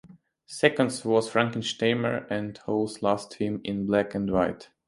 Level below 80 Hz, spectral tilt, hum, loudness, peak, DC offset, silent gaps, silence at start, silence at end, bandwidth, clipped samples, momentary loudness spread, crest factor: -58 dBFS; -5 dB/octave; none; -27 LUFS; -4 dBFS; under 0.1%; none; 0.1 s; 0.25 s; 11.5 kHz; under 0.1%; 7 LU; 24 dB